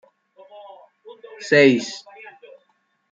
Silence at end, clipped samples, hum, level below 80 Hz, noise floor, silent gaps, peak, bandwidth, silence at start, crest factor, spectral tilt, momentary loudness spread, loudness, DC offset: 1.15 s; under 0.1%; none; -72 dBFS; -67 dBFS; none; -2 dBFS; 7.8 kHz; 1.4 s; 20 dB; -5 dB/octave; 28 LU; -17 LUFS; under 0.1%